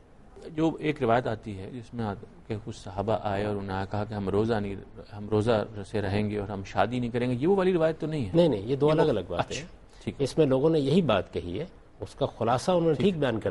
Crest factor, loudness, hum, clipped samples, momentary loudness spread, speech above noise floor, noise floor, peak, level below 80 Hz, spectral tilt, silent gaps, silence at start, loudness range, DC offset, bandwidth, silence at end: 18 dB; -27 LUFS; none; under 0.1%; 15 LU; 20 dB; -47 dBFS; -10 dBFS; -52 dBFS; -7 dB/octave; none; 0.35 s; 5 LU; under 0.1%; 11.5 kHz; 0 s